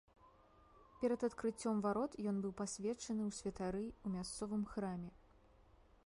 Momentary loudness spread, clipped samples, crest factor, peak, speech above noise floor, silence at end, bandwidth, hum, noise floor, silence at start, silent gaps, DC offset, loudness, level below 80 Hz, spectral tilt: 6 LU; under 0.1%; 18 dB; -26 dBFS; 26 dB; 0.45 s; 11.5 kHz; none; -67 dBFS; 0.25 s; none; under 0.1%; -42 LUFS; -66 dBFS; -5.5 dB/octave